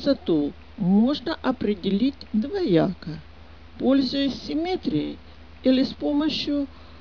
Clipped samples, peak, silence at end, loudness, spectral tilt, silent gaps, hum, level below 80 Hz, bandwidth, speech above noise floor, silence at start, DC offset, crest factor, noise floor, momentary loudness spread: under 0.1%; -6 dBFS; 0 s; -24 LUFS; -7.5 dB/octave; none; none; -48 dBFS; 5.4 kHz; 23 dB; 0 s; 0.4%; 18 dB; -46 dBFS; 9 LU